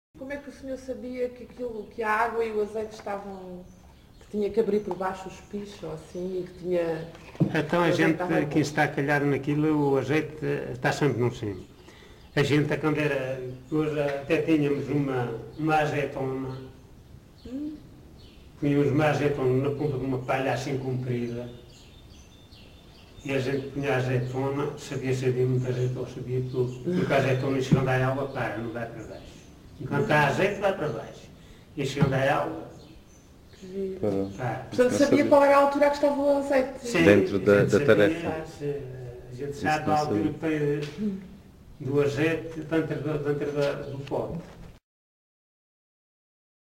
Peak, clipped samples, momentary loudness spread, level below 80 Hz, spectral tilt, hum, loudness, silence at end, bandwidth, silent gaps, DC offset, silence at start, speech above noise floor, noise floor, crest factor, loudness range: -4 dBFS; under 0.1%; 16 LU; -54 dBFS; -6.5 dB/octave; none; -26 LUFS; 2.05 s; 16 kHz; none; under 0.1%; 0.15 s; 26 dB; -52 dBFS; 22 dB; 9 LU